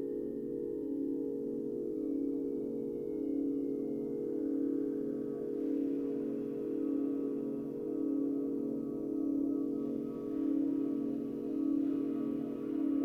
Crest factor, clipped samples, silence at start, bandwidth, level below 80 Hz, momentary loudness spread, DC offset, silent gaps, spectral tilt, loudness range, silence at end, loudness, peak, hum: 12 dB; under 0.1%; 0 s; 3.2 kHz; -68 dBFS; 4 LU; under 0.1%; none; -10 dB/octave; 2 LU; 0 s; -36 LUFS; -24 dBFS; none